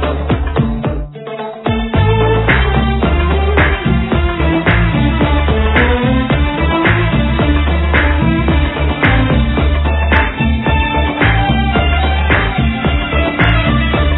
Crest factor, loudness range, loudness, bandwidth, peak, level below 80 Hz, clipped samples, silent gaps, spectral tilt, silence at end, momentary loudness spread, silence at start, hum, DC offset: 12 dB; 1 LU; -13 LUFS; 4.1 kHz; 0 dBFS; -16 dBFS; under 0.1%; none; -10 dB/octave; 0 s; 4 LU; 0 s; none; under 0.1%